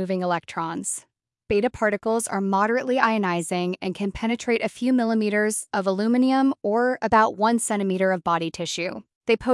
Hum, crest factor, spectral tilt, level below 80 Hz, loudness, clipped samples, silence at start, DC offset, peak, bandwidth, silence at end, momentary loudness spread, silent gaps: none; 18 dB; -4.5 dB/octave; -56 dBFS; -23 LUFS; under 0.1%; 0 s; under 0.1%; -6 dBFS; 12 kHz; 0 s; 8 LU; 9.15-9.21 s